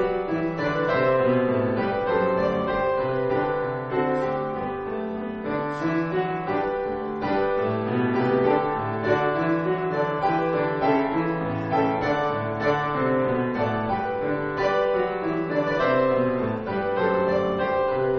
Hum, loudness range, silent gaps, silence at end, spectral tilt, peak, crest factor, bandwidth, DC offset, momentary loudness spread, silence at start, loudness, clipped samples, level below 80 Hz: none; 3 LU; none; 0 s; -5.5 dB/octave; -8 dBFS; 16 dB; 6.4 kHz; under 0.1%; 5 LU; 0 s; -24 LUFS; under 0.1%; -50 dBFS